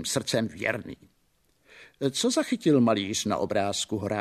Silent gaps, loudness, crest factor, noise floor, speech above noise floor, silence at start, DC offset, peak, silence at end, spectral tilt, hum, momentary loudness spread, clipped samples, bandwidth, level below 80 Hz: none; -26 LUFS; 18 dB; -69 dBFS; 42 dB; 0 s; under 0.1%; -10 dBFS; 0 s; -4 dB/octave; none; 8 LU; under 0.1%; 14 kHz; -64 dBFS